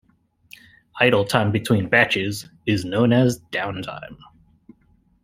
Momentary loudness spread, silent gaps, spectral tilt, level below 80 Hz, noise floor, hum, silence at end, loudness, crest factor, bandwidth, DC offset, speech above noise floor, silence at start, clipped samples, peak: 16 LU; none; -5.5 dB/octave; -56 dBFS; -60 dBFS; none; 1.1 s; -20 LUFS; 20 dB; 15.5 kHz; under 0.1%; 39 dB; 0.95 s; under 0.1%; -2 dBFS